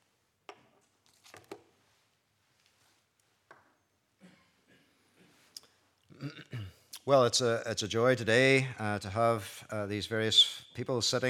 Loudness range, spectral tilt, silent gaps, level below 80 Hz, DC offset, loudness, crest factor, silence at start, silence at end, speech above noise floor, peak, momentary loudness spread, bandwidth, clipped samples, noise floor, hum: 22 LU; -3.5 dB/octave; none; -78 dBFS; under 0.1%; -28 LUFS; 22 dB; 1.5 s; 0 s; 46 dB; -12 dBFS; 25 LU; 16.5 kHz; under 0.1%; -74 dBFS; none